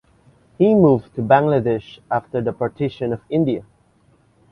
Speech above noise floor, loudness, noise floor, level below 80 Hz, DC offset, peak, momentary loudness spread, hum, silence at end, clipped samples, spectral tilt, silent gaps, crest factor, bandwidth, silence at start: 39 dB; -19 LUFS; -57 dBFS; -52 dBFS; under 0.1%; 0 dBFS; 10 LU; none; 0.9 s; under 0.1%; -10 dB/octave; none; 20 dB; 5.8 kHz; 0.6 s